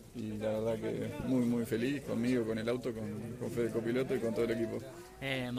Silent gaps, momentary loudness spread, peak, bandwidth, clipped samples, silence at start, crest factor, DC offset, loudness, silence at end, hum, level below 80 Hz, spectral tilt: none; 8 LU; -22 dBFS; 15.5 kHz; under 0.1%; 0 s; 14 dB; under 0.1%; -35 LUFS; 0 s; none; -60 dBFS; -6.5 dB/octave